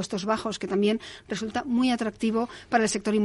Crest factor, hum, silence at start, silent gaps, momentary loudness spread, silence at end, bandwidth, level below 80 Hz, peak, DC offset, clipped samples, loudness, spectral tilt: 18 dB; none; 0 s; none; 7 LU; 0 s; 11.5 kHz; -58 dBFS; -8 dBFS; under 0.1%; under 0.1%; -27 LUFS; -4.5 dB/octave